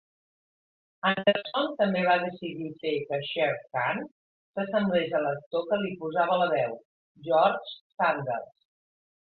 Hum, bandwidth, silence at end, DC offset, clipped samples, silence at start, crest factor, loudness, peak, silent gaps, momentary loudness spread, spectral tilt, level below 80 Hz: none; 4.6 kHz; 0.9 s; under 0.1%; under 0.1%; 1.05 s; 20 dB; -28 LUFS; -10 dBFS; 4.11-4.54 s, 5.46-5.51 s, 6.85-7.15 s, 7.81-7.90 s; 11 LU; -9 dB/octave; -72 dBFS